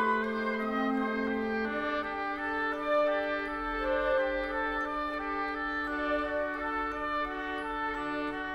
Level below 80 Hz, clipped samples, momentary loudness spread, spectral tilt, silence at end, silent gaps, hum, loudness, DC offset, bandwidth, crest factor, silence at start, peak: -52 dBFS; under 0.1%; 5 LU; -6 dB/octave; 0 s; none; none; -32 LUFS; under 0.1%; 12.5 kHz; 14 dB; 0 s; -18 dBFS